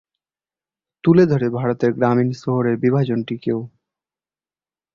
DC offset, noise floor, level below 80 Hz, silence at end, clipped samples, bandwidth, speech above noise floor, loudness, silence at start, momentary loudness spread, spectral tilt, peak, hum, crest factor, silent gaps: under 0.1%; under -90 dBFS; -58 dBFS; 1.25 s; under 0.1%; 7.2 kHz; over 73 dB; -19 LUFS; 1.05 s; 9 LU; -9 dB/octave; -2 dBFS; none; 18 dB; none